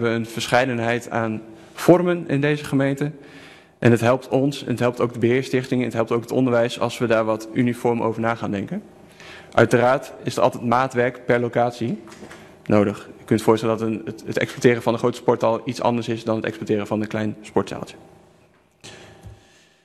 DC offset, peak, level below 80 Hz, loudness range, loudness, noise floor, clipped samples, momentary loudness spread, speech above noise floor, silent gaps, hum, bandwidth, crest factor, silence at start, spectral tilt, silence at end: under 0.1%; 0 dBFS; -58 dBFS; 3 LU; -21 LUFS; -56 dBFS; under 0.1%; 12 LU; 36 dB; none; none; 13.5 kHz; 22 dB; 0 s; -6.5 dB/octave; 0.5 s